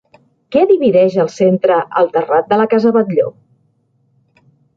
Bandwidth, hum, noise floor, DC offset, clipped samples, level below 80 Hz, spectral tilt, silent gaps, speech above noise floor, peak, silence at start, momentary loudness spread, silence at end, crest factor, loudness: 7.6 kHz; none; -59 dBFS; under 0.1%; under 0.1%; -60 dBFS; -7.5 dB/octave; none; 47 dB; -2 dBFS; 0.5 s; 6 LU; 1.45 s; 14 dB; -13 LUFS